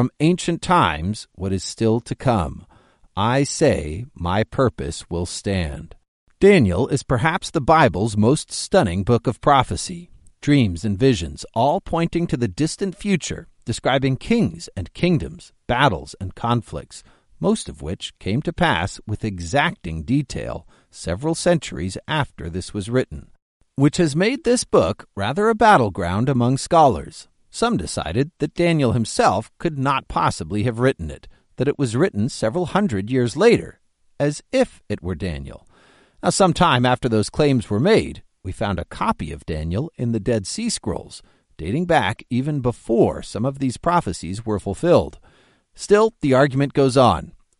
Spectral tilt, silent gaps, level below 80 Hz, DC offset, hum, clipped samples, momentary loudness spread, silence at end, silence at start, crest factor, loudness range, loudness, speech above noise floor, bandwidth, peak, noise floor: -5.5 dB/octave; 6.08-6.27 s, 23.42-23.60 s; -40 dBFS; under 0.1%; none; under 0.1%; 13 LU; 0.3 s; 0 s; 18 dB; 5 LU; -20 LUFS; 36 dB; 11.5 kHz; -2 dBFS; -55 dBFS